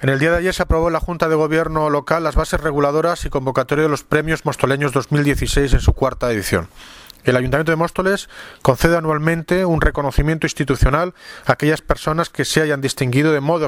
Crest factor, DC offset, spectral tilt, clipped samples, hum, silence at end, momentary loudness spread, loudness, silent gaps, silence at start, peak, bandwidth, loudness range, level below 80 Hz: 18 dB; under 0.1%; -5.5 dB/octave; under 0.1%; none; 0 s; 4 LU; -18 LUFS; none; 0 s; 0 dBFS; 16.5 kHz; 1 LU; -26 dBFS